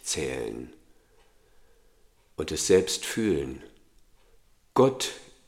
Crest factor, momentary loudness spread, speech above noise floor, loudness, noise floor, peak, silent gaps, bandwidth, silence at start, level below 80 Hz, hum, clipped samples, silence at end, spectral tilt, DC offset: 22 dB; 19 LU; 34 dB; -27 LUFS; -61 dBFS; -8 dBFS; none; 16.5 kHz; 0.05 s; -54 dBFS; none; under 0.1%; 0.25 s; -4 dB/octave; under 0.1%